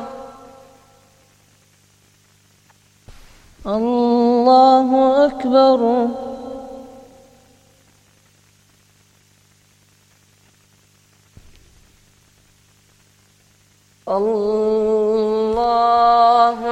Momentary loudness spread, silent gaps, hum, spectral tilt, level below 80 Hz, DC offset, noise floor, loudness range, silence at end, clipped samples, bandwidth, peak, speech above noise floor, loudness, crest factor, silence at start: 21 LU; none; 50 Hz at -60 dBFS; -6 dB/octave; -52 dBFS; under 0.1%; -55 dBFS; 14 LU; 0 s; under 0.1%; 10.5 kHz; -2 dBFS; 41 dB; -15 LUFS; 18 dB; 0 s